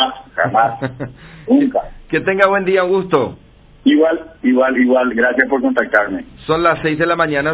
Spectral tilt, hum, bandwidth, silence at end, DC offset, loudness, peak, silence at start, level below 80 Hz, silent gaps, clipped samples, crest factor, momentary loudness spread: -9.5 dB/octave; none; 4 kHz; 0 s; under 0.1%; -15 LUFS; 0 dBFS; 0 s; -46 dBFS; none; under 0.1%; 16 dB; 10 LU